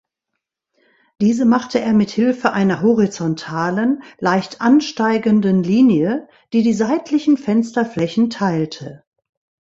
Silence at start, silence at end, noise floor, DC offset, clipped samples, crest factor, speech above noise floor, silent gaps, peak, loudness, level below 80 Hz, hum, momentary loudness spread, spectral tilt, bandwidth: 1.2 s; 0.75 s; -79 dBFS; under 0.1%; under 0.1%; 16 dB; 62 dB; none; 0 dBFS; -17 LUFS; -58 dBFS; none; 7 LU; -6.5 dB/octave; 7.8 kHz